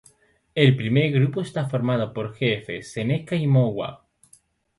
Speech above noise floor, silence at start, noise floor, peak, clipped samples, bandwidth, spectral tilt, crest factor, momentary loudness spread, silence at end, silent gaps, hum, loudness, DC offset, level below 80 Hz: 37 dB; 0.55 s; -59 dBFS; -2 dBFS; under 0.1%; 11.5 kHz; -7.5 dB/octave; 20 dB; 11 LU; 0.85 s; none; none; -23 LUFS; under 0.1%; -60 dBFS